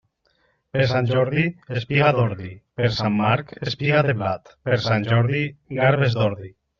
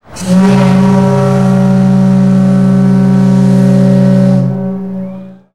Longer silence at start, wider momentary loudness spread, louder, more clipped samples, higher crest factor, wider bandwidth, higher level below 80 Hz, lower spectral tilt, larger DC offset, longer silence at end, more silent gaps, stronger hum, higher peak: first, 0.75 s vs 0.1 s; about the same, 10 LU vs 10 LU; second, -21 LUFS vs -8 LUFS; neither; first, 18 dB vs 8 dB; second, 7 kHz vs 10.5 kHz; second, -54 dBFS vs -44 dBFS; second, -5 dB/octave vs -8.5 dB/octave; second, under 0.1% vs 2%; about the same, 0.3 s vs 0.2 s; neither; neither; second, -4 dBFS vs 0 dBFS